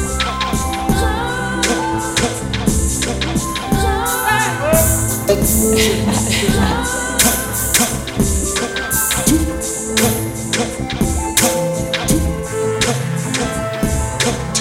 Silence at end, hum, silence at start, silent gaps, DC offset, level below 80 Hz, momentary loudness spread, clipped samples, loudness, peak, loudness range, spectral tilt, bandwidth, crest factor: 0 s; none; 0 s; none; under 0.1%; -26 dBFS; 6 LU; under 0.1%; -16 LUFS; 0 dBFS; 3 LU; -3.5 dB/octave; 17 kHz; 16 dB